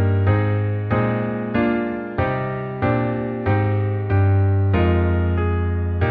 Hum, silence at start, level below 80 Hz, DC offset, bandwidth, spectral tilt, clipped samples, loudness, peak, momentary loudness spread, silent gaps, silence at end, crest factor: none; 0 s; -34 dBFS; under 0.1%; 4.3 kHz; -11 dB/octave; under 0.1%; -20 LUFS; -6 dBFS; 5 LU; none; 0 s; 12 dB